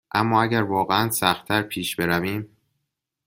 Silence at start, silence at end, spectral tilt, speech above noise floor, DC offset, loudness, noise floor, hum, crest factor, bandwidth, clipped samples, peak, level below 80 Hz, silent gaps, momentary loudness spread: 0.15 s; 0.8 s; -4.5 dB/octave; 57 dB; under 0.1%; -22 LUFS; -79 dBFS; none; 22 dB; 16.5 kHz; under 0.1%; -2 dBFS; -56 dBFS; none; 8 LU